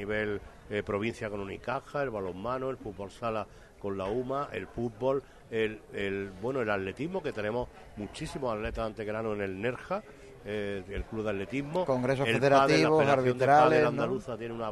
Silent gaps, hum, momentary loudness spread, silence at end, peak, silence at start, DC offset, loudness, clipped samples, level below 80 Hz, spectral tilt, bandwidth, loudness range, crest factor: none; none; 15 LU; 0 s; -10 dBFS; 0 s; under 0.1%; -30 LUFS; under 0.1%; -52 dBFS; -6 dB/octave; 12 kHz; 10 LU; 20 dB